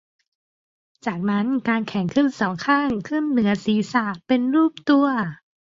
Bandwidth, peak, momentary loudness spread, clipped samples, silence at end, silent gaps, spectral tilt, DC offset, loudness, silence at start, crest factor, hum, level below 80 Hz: 7.6 kHz; -6 dBFS; 7 LU; under 0.1%; 0.25 s; none; -6.5 dB/octave; under 0.1%; -21 LUFS; 1.05 s; 16 dB; none; -60 dBFS